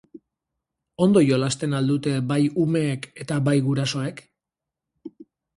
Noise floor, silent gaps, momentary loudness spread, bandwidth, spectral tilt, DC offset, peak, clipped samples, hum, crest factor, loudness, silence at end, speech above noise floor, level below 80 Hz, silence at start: -87 dBFS; none; 12 LU; 11.5 kHz; -6.5 dB/octave; under 0.1%; -6 dBFS; under 0.1%; none; 18 dB; -22 LUFS; 0.35 s; 65 dB; -62 dBFS; 0.15 s